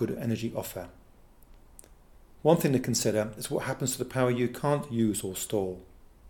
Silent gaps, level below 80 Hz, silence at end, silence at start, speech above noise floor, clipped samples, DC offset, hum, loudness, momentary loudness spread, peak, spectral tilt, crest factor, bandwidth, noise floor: none; -56 dBFS; 0 s; 0 s; 26 dB; under 0.1%; under 0.1%; none; -29 LUFS; 11 LU; -8 dBFS; -5 dB/octave; 22 dB; 19 kHz; -54 dBFS